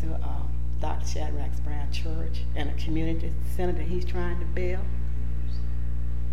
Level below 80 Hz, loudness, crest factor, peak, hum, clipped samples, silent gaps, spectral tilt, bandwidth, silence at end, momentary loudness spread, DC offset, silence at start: -30 dBFS; -31 LUFS; 12 dB; -14 dBFS; 60 Hz at -30 dBFS; under 0.1%; none; -7 dB/octave; 12.5 kHz; 0 s; 3 LU; 8%; 0 s